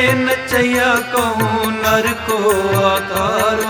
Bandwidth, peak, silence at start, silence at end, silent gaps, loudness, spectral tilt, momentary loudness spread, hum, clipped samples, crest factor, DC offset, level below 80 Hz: over 20 kHz; 0 dBFS; 0 s; 0 s; none; -15 LUFS; -4 dB/octave; 3 LU; none; under 0.1%; 14 dB; under 0.1%; -42 dBFS